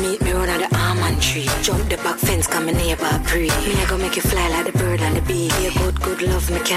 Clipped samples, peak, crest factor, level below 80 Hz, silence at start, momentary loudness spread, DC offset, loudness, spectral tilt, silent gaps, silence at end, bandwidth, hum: under 0.1%; -6 dBFS; 14 dB; -26 dBFS; 0 s; 2 LU; under 0.1%; -19 LUFS; -4 dB/octave; none; 0 s; 16 kHz; none